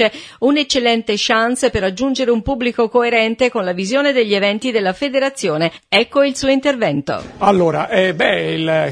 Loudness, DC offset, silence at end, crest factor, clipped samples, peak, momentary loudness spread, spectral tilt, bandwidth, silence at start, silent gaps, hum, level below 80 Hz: -16 LUFS; under 0.1%; 0 s; 16 dB; under 0.1%; 0 dBFS; 4 LU; -4.5 dB/octave; 11 kHz; 0 s; none; none; -44 dBFS